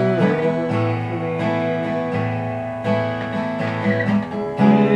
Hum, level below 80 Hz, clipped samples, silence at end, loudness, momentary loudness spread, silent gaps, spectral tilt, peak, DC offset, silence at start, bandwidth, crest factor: none; -54 dBFS; under 0.1%; 0 s; -21 LUFS; 6 LU; none; -8.5 dB/octave; -2 dBFS; under 0.1%; 0 s; 8.6 kHz; 16 dB